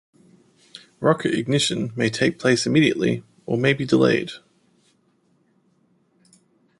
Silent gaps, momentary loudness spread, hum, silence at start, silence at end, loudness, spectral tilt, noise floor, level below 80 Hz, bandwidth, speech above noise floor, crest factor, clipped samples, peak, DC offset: none; 8 LU; none; 1 s; 2.4 s; -21 LUFS; -5 dB/octave; -64 dBFS; -60 dBFS; 11.5 kHz; 44 dB; 20 dB; under 0.1%; -2 dBFS; under 0.1%